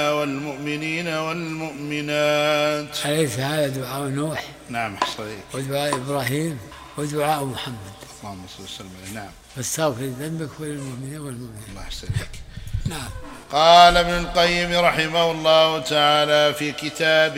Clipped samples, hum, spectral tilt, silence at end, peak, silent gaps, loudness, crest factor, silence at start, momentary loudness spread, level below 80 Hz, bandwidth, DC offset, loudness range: under 0.1%; none; -4 dB/octave; 0 s; 0 dBFS; none; -21 LUFS; 22 dB; 0 s; 19 LU; -42 dBFS; 16 kHz; under 0.1%; 12 LU